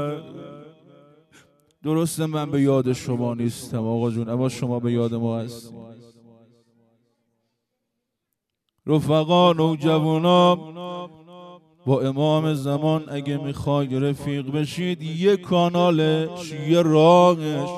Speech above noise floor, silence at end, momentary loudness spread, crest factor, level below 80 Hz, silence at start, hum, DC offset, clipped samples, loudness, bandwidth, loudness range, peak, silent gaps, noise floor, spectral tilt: 60 dB; 0 s; 16 LU; 18 dB; -62 dBFS; 0 s; none; under 0.1%; under 0.1%; -21 LUFS; 13.5 kHz; 8 LU; -4 dBFS; none; -80 dBFS; -7 dB/octave